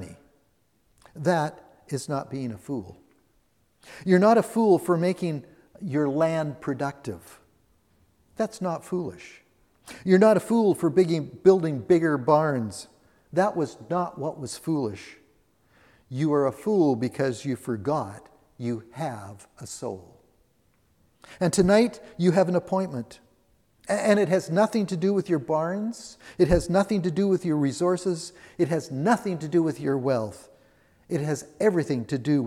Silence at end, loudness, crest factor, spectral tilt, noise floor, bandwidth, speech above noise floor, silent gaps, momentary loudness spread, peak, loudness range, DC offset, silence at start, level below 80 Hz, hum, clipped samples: 0 s; -25 LUFS; 20 dB; -6.5 dB/octave; -68 dBFS; 14.5 kHz; 44 dB; none; 16 LU; -6 dBFS; 9 LU; under 0.1%; 0 s; -52 dBFS; none; under 0.1%